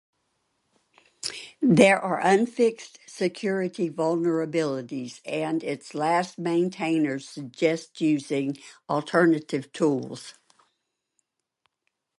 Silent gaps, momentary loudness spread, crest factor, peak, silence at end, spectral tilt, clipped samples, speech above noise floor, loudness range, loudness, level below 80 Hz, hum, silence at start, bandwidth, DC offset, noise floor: none; 13 LU; 24 dB; -2 dBFS; 1.9 s; -5.5 dB/octave; under 0.1%; 54 dB; 5 LU; -25 LUFS; -72 dBFS; none; 1.25 s; 11.5 kHz; under 0.1%; -79 dBFS